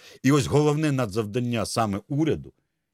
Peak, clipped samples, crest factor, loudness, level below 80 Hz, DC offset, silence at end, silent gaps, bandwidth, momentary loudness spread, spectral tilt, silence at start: -8 dBFS; under 0.1%; 16 dB; -24 LUFS; -54 dBFS; under 0.1%; 0.45 s; none; 15.5 kHz; 6 LU; -6 dB/octave; 0.05 s